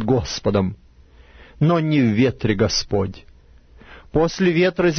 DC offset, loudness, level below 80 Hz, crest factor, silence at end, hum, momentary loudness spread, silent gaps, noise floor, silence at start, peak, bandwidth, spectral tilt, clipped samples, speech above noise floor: under 0.1%; -20 LUFS; -40 dBFS; 16 dB; 0 s; none; 7 LU; none; -48 dBFS; 0 s; -4 dBFS; 6.6 kHz; -6 dB/octave; under 0.1%; 30 dB